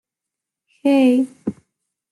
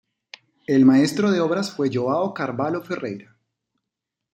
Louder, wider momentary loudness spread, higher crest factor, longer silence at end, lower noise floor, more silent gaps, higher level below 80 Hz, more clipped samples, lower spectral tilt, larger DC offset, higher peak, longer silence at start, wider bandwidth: first, -17 LUFS vs -21 LUFS; about the same, 15 LU vs 14 LU; about the same, 14 dB vs 18 dB; second, 0.6 s vs 1.15 s; about the same, -85 dBFS vs -84 dBFS; neither; about the same, -68 dBFS vs -66 dBFS; neither; about the same, -6 dB/octave vs -6.5 dB/octave; neither; about the same, -6 dBFS vs -4 dBFS; first, 0.85 s vs 0.7 s; second, 12 kHz vs 13.5 kHz